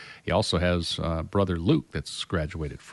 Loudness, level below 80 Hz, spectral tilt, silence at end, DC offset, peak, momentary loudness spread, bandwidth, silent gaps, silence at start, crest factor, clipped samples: -27 LUFS; -42 dBFS; -5.5 dB/octave; 0 s; under 0.1%; -10 dBFS; 9 LU; 11.5 kHz; none; 0 s; 16 dB; under 0.1%